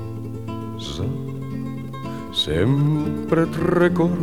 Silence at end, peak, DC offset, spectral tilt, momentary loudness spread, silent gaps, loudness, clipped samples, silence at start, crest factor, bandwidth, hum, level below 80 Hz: 0 s; -4 dBFS; 0.8%; -7 dB/octave; 13 LU; none; -23 LUFS; under 0.1%; 0 s; 18 dB; 15.5 kHz; none; -44 dBFS